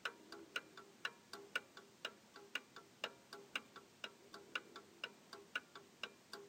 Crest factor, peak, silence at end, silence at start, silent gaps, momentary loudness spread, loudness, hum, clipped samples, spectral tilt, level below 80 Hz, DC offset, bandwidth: 26 dB; -26 dBFS; 0 s; 0 s; none; 12 LU; -50 LUFS; none; under 0.1%; -1 dB/octave; under -90 dBFS; under 0.1%; 16.5 kHz